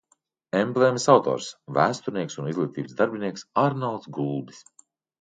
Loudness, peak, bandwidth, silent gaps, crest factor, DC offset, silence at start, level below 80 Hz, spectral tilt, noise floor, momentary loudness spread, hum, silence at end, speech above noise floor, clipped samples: -25 LUFS; -2 dBFS; 9.2 kHz; none; 22 dB; under 0.1%; 0.55 s; -70 dBFS; -5.5 dB/octave; -69 dBFS; 11 LU; none; 0.6 s; 45 dB; under 0.1%